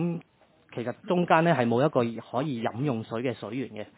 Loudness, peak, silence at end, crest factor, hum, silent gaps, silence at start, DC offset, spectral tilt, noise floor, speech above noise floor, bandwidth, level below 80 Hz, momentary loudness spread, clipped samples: -27 LUFS; -6 dBFS; 0.1 s; 22 dB; none; none; 0 s; under 0.1%; -11 dB/octave; -62 dBFS; 35 dB; 4 kHz; -70 dBFS; 13 LU; under 0.1%